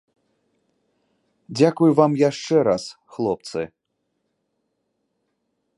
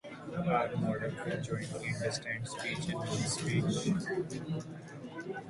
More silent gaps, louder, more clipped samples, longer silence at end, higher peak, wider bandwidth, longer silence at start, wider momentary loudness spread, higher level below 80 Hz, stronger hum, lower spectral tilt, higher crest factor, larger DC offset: neither; first, -20 LUFS vs -35 LUFS; neither; first, 2.1 s vs 0 s; first, -2 dBFS vs -18 dBFS; about the same, 11.5 kHz vs 11.5 kHz; first, 1.5 s vs 0.05 s; first, 16 LU vs 10 LU; about the same, -64 dBFS vs -62 dBFS; neither; first, -6.5 dB/octave vs -5 dB/octave; about the same, 22 dB vs 18 dB; neither